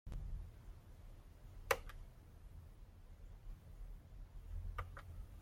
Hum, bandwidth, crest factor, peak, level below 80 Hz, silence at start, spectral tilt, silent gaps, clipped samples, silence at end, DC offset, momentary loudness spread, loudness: none; 16.5 kHz; 34 dB; -16 dBFS; -52 dBFS; 0.05 s; -4 dB/octave; none; under 0.1%; 0 s; under 0.1%; 20 LU; -50 LUFS